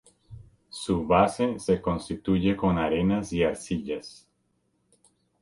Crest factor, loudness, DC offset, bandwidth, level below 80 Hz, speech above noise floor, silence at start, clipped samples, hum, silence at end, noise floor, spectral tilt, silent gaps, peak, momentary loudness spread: 22 dB; -26 LUFS; under 0.1%; 11.5 kHz; -48 dBFS; 47 dB; 0.3 s; under 0.1%; none; 1.3 s; -72 dBFS; -6.5 dB/octave; none; -6 dBFS; 13 LU